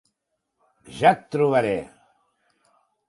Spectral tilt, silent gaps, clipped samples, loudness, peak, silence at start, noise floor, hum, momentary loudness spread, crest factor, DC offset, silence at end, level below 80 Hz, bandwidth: -6.5 dB/octave; none; under 0.1%; -21 LUFS; -2 dBFS; 0.9 s; -78 dBFS; none; 20 LU; 22 dB; under 0.1%; 1.25 s; -62 dBFS; 11.5 kHz